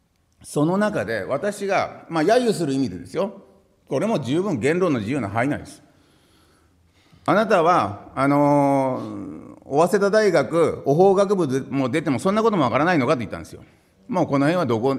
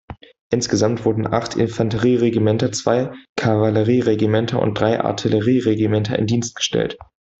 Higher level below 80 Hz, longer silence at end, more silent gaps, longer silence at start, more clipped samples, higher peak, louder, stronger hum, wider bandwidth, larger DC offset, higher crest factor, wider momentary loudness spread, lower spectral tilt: second, -60 dBFS vs -50 dBFS; second, 0 s vs 0.45 s; second, none vs 0.41-0.50 s, 3.29-3.36 s; first, 0.45 s vs 0.1 s; neither; about the same, -4 dBFS vs -2 dBFS; about the same, -21 LUFS vs -19 LUFS; neither; first, 14 kHz vs 8 kHz; neither; about the same, 18 dB vs 16 dB; first, 11 LU vs 5 LU; about the same, -6.5 dB/octave vs -6 dB/octave